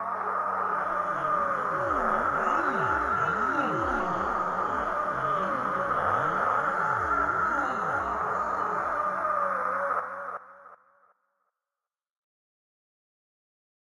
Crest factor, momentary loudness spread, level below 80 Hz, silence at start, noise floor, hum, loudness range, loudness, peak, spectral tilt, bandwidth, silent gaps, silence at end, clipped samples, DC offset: 16 dB; 3 LU; -54 dBFS; 0 s; under -90 dBFS; none; 6 LU; -27 LUFS; -12 dBFS; -6 dB/octave; 11.5 kHz; none; 3.25 s; under 0.1%; under 0.1%